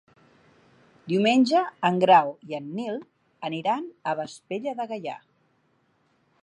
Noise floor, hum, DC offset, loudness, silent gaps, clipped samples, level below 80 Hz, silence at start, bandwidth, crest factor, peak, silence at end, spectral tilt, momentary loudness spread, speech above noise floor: -67 dBFS; none; under 0.1%; -25 LUFS; none; under 0.1%; -78 dBFS; 1.05 s; 10.5 kHz; 22 dB; -4 dBFS; 1.25 s; -5.5 dB/octave; 17 LU; 43 dB